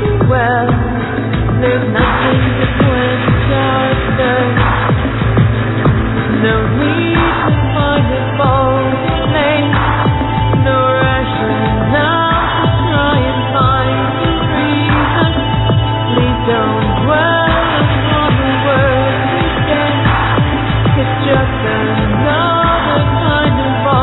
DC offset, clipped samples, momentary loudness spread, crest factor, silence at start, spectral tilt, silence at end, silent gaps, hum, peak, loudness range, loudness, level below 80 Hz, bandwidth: under 0.1%; under 0.1%; 3 LU; 12 dB; 0 s; -10.5 dB/octave; 0 s; none; none; 0 dBFS; 1 LU; -12 LUFS; -24 dBFS; 4.1 kHz